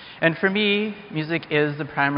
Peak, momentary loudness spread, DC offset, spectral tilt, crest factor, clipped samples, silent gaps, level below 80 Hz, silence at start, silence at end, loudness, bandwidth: -4 dBFS; 7 LU; under 0.1%; -3.5 dB/octave; 20 dB; under 0.1%; none; -62 dBFS; 0 s; 0 s; -22 LUFS; 5.4 kHz